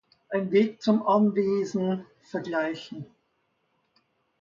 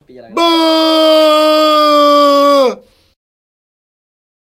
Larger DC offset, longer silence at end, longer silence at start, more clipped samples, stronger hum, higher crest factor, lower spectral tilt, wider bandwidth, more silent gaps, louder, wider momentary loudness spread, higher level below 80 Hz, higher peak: neither; second, 1.4 s vs 1.75 s; about the same, 0.3 s vs 0.3 s; neither; neither; first, 18 dB vs 12 dB; first, -7 dB/octave vs -2 dB/octave; second, 7.4 kHz vs 16 kHz; neither; second, -26 LUFS vs -9 LUFS; first, 15 LU vs 7 LU; second, -72 dBFS vs -62 dBFS; second, -10 dBFS vs 0 dBFS